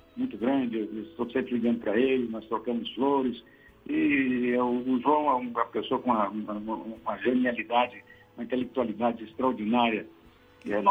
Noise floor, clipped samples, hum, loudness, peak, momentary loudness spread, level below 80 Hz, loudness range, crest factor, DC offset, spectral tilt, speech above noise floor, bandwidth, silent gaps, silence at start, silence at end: -56 dBFS; under 0.1%; none; -28 LUFS; -10 dBFS; 10 LU; -64 dBFS; 2 LU; 18 dB; under 0.1%; -7.5 dB/octave; 28 dB; 4.6 kHz; none; 0.15 s; 0 s